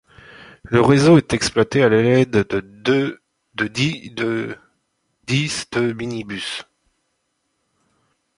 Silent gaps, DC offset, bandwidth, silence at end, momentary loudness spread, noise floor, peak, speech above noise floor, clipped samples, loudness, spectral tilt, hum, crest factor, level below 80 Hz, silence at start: none; under 0.1%; 11.5 kHz; 1.75 s; 14 LU; -71 dBFS; -2 dBFS; 54 dB; under 0.1%; -18 LUFS; -5.5 dB/octave; none; 18 dB; -50 dBFS; 0.4 s